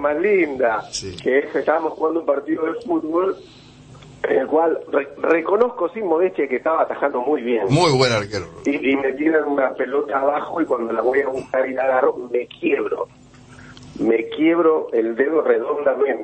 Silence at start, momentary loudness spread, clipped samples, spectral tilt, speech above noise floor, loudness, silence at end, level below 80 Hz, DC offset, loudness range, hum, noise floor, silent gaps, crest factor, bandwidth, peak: 0 s; 7 LU; under 0.1%; -5.5 dB/octave; 24 dB; -20 LUFS; 0 s; -56 dBFS; under 0.1%; 3 LU; none; -43 dBFS; none; 16 dB; 8.8 kHz; -4 dBFS